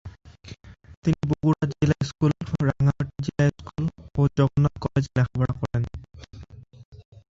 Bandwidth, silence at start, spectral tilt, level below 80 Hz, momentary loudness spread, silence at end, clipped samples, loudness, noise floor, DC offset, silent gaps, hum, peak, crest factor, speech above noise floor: 7.6 kHz; 0.05 s; -8 dB/octave; -44 dBFS; 23 LU; 0.3 s; under 0.1%; -25 LUFS; -44 dBFS; under 0.1%; 0.97-1.02 s, 6.85-6.92 s; none; -8 dBFS; 18 dB; 22 dB